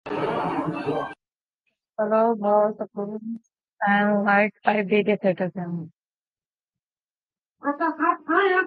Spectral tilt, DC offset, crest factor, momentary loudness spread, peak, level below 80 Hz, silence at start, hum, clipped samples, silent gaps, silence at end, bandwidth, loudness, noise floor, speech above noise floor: -8.5 dB/octave; under 0.1%; 22 dB; 14 LU; -2 dBFS; -68 dBFS; 0.05 s; none; under 0.1%; 1.41-1.49 s, 6.05-6.09 s, 6.15-6.36 s, 6.45-6.68 s, 6.82-6.91 s, 7.05-7.10 s, 7.17-7.28 s, 7.38-7.50 s; 0 s; 5 kHz; -23 LUFS; under -90 dBFS; over 67 dB